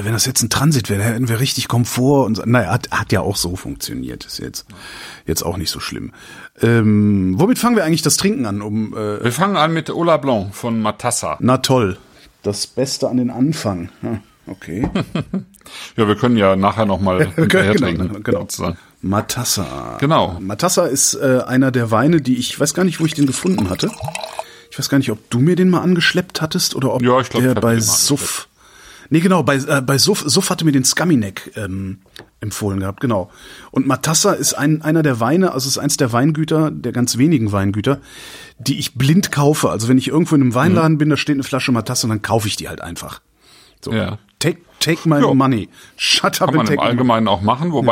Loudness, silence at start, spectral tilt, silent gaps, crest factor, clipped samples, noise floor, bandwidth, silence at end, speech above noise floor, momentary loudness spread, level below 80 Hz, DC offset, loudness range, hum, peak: -16 LUFS; 0 s; -4.5 dB/octave; none; 16 dB; under 0.1%; -49 dBFS; 16.5 kHz; 0 s; 32 dB; 13 LU; -46 dBFS; under 0.1%; 5 LU; none; 0 dBFS